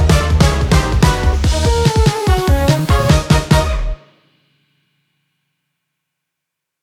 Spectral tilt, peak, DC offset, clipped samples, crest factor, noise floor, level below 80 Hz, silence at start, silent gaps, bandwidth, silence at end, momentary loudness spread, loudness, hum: -5.5 dB/octave; 0 dBFS; under 0.1%; under 0.1%; 14 dB; -79 dBFS; -18 dBFS; 0 s; none; 16 kHz; 2.85 s; 3 LU; -14 LUFS; none